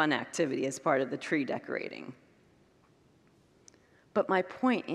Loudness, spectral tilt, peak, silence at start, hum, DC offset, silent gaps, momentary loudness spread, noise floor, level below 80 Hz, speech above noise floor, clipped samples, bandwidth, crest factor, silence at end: -32 LUFS; -4.5 dB/octave; -12 dBFS; 0 s; none; under 0.1%; none; 9 LU; -65 dBFS; -80 dBFS; 34 dB; under 0.1%; 13 kHz; 22 dB; 0 s